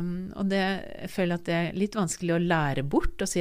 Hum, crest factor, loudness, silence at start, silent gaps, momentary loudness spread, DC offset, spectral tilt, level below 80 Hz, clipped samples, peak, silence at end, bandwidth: none; 16 dB; -28 LUFS; 0 s; none; 6 LU; under 0.1%; -5.5 dB/octave; -40 dBFS; under 0.1%; -12 dBFS; 0 s; 15.5 kHz